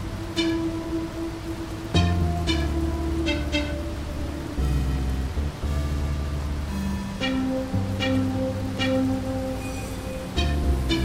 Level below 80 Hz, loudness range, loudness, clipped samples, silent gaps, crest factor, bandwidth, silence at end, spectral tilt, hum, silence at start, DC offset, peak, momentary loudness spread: -30 dBFS; 2 LU; -27 LUFS; under 0.1%; none; 16 dB; 16 kHz; 0 s; -6 dB/octave; none; 0 s; under 0.1%; -8 dBFS; 8 LU